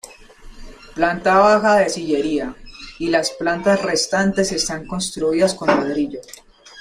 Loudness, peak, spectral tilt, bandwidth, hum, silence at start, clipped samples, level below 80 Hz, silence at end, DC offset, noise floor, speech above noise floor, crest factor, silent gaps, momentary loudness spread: -18 LUFS; -2 dBFS; -4 dB/octave; 15.5 kHz; none; 0.05 s; under 0.1%; -44 dBFS; 0 s; under 0.1%; -41 dBFS; 23 dB; 16 dB; none; 13 LU